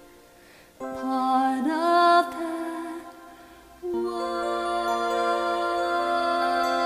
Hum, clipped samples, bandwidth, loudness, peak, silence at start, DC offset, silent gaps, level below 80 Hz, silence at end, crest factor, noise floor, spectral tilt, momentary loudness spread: none; under 0.1%; 15.5 kHz; -25 LUFS; -8 dBFS; 0 s; under 0.1%; none; -60 dBFS; 0 s; 18 dB; -52 dBFS; -3.5 dB/octave; 16 LU